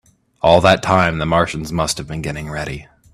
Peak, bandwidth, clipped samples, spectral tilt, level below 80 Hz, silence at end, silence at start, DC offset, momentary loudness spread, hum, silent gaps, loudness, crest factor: 0 dBFS; 14 kHz; under 0.1%; -5 dB/octave; -40 dBFS; 0.3 s; 0.45 s; under 0.1%; 13 LU; none; none; -17 LUFS; 18 dB